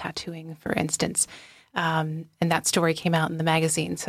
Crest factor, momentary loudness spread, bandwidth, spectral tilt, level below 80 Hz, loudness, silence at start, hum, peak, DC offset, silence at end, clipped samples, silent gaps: 18 dB; 11 LU; 15.5 kHz; -4 dB/octave; -60 dBFS; -25 LUFS; 0 s; none; -8 dBFS; under 0.1%; 0 s; under 0.1%; none